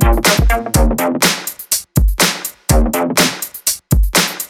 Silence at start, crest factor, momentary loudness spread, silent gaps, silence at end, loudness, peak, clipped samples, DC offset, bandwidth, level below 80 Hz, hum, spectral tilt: 0 s; 14 dB; 6 LU; none; 0.05 s; -14 LUFS; 0 dBFS; under 0.1%; under 0.1%; 17 kHz; -18 dBFS; none; -3.5 dB/octave